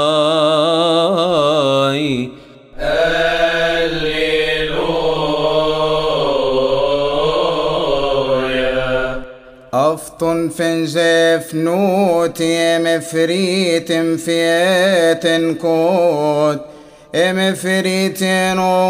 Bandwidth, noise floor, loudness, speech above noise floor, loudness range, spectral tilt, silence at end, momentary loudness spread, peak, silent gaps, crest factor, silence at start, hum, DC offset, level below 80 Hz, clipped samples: 16 kHz; -37 dBFS; -15 LUFS; 22 dB; 2 LU; -4.5 dB/octave; 0 s; 4 LU; -2 dBFS; none; 14 dB; 0 s; none; under 0.1%; -38 dBFS; under 0.1%